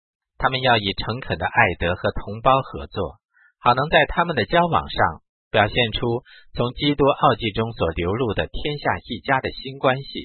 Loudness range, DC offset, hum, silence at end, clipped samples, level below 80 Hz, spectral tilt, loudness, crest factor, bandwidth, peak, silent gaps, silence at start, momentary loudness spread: 2 LU; under 0.1%; none; 0 s; under 0.1%; -40 dBFS; -10.5 dB/octave; -21 LUFS; 22 dB; 4.5 kHz; 0 dBFS; 3.25-3.29 s, 5.29-5.51 s; 0.4 s; 9 LU